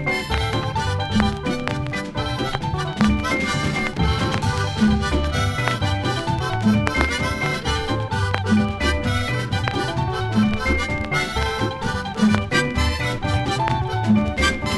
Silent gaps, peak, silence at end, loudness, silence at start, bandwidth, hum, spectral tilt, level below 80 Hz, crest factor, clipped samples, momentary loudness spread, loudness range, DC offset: none; 0 dBFS; 0 s; -21 LUFS; 0 s; 12.5 kHz; none; -5.5 dB/octave; -30 dBFS; 20 dB; under 0.1%; 5 LU; 1 LU; under 0.1%